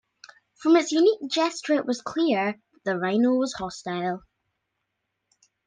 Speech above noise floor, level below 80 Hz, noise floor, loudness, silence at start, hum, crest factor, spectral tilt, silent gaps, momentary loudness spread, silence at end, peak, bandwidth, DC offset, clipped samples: 56 dB; -66 dBFS; -80 dBFS; -24 LUFS; 0.6 s; none; 18 dB; -4.5 dB/octave; none; 10 LU; 1.5 s; -8 dBFS; 9.8 kHz; under 0.1%; under 0.1%